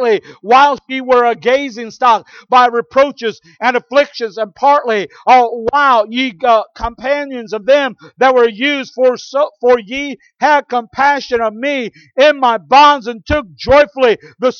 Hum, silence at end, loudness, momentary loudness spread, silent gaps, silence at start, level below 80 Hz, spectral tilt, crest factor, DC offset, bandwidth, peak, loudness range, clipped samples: none; 0.05 s; -13 LUFS; 11 LU; none; 0 s; -42 dBFS; -4 dB/octave; 12 dB; under 0.1%; 7 kHz; 0 dBFS; 2 LU; under 0.1%